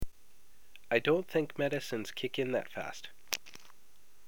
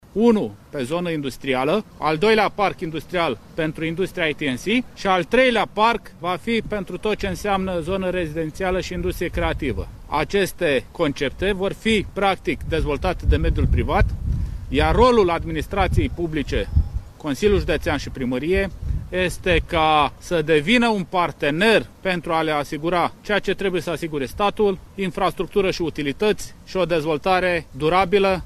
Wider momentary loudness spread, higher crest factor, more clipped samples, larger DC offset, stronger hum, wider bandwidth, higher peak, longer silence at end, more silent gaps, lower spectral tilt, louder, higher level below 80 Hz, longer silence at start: first, 19 LU vs 9 LU; first, 24 dB vs 18 dB; neither; first, 0.5% vs under 0.1%; neither; first, over 20 kHz vs 14.5 kHz; second, -10 dBFS vs -2 dBFS; first, 0.7 s vs 0 s; neither; second, -4 dB/octave vs -5.5 dB/octave; second, -34 LUFS vs -21 LUFS; second, -58 dBFS vs -32 dBFS; second, 0 s vs 0.15 s